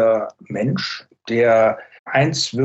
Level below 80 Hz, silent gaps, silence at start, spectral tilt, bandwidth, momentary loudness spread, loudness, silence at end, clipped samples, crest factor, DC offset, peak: -62 dBFS; 1.99-2.05 s; 0 s; -5 dB/octave; 8.4 kHz; 13 LU; -19 LUFS; 0 s; under 0.1%; 14 dB; under 0.1%; -4 dBFS